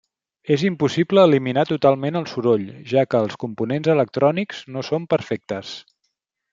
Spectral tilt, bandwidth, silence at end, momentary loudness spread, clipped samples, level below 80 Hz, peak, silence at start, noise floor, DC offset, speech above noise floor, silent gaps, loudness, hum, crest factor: -7 dB/octave; 7.6 kHz; 0.7 s; 13 LU; under 0.1%; -64 dBFS; -2 dBFS; 0.45 s; -75 dBFS; under 0.1%; 55 dB; none; -20 LUFS; none; 18 dB